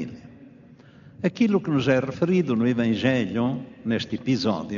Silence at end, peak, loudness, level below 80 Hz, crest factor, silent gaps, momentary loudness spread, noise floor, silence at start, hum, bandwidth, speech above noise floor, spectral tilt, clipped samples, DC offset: 0 s; -8 dBFS; -24 LUFS; -62 dBFS; 16 dB; none; 7 LU; -49 dBFS; 0 s; none; 7.2 kHz; 26 dB; -6 dB/octave; under 0.1%; under 0.1%